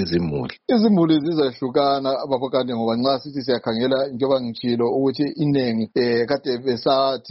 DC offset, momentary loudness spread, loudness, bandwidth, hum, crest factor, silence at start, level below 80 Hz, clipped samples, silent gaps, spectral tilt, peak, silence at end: under 0.1%; 5 LU; -21 LUFS; 6 kHz; none; 14 dB; 0 s; -54 dBFS; under 0.1%; none; -5 dB/octave; -6 dBFS; 0 s